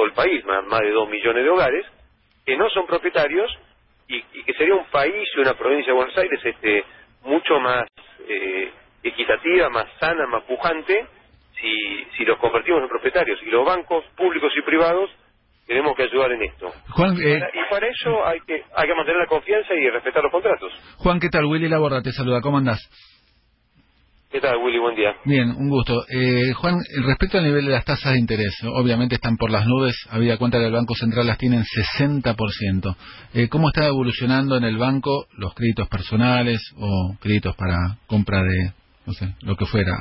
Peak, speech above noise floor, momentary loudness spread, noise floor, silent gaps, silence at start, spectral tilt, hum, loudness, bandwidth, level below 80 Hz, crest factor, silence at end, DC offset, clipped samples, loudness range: -4 dBFS; 41 dB; 8 LU; -61 dBFS; none; 0 s; -11 dB/octave; none; -20 LUFS; 5.8 kHz; -40 dBFS; 16 dB; 0 s; under 0.1%; under 0.1%; 2 LU